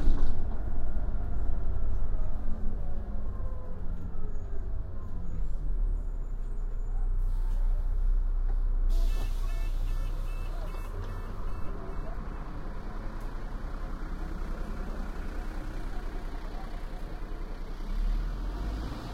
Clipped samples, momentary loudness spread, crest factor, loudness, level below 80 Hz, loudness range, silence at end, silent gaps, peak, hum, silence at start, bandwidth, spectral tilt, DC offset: under 0.1%; 8 LU; 18 dB; -38 LUFS; -30 dBFS; 6 LU; 0 s; none; -10 dBFS; none; 0 s; 5.2 kHz; -7 dB/octave; under 0.1%